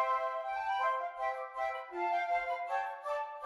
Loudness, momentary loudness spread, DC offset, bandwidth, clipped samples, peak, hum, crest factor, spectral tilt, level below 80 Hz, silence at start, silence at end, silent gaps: -35 LUFS; 5 LU; under 0.1%; 12 kHz; under 0.1%; -20 dBFS; none; 16 dB; -2.5 dB/octave; -72 dBFS; 0 s; 0 s; none